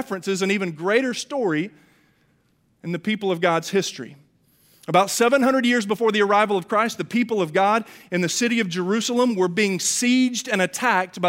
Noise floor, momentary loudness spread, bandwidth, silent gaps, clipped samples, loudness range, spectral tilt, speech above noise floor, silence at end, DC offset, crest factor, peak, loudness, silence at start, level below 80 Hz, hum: -64 dBFS; 8 LU; 16 kHz; none; under 0.1%; 5 LU; -4 dB/octave; 43 dB; 0 s; under 0.1%; 20 dB; -2 dBFS; -21 LUFS; 0 s; -72 dBFS; none